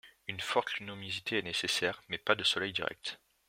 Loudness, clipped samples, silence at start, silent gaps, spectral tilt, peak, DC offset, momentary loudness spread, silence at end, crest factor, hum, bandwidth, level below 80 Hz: -33 LUFS; under 0.1%; 0.05 s; none; -2.5 dB/octave; -10 dBFS; under 0.1%; 10 LU; 0.3 s; 26 dB; none; 16.5 kHz; -72 dBFS